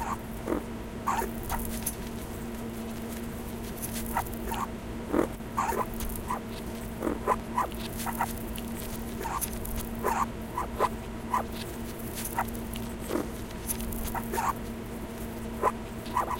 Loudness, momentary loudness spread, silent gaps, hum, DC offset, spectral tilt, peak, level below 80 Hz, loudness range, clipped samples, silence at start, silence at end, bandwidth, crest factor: -33 LUFS; 8 LU; none; none; under 0.1%; -4.5 dB/octave; -12 dBFS; -42 dBFS; 2 LU; under 0.1%; 0 s; 0 s; 17 kHz; 20 dB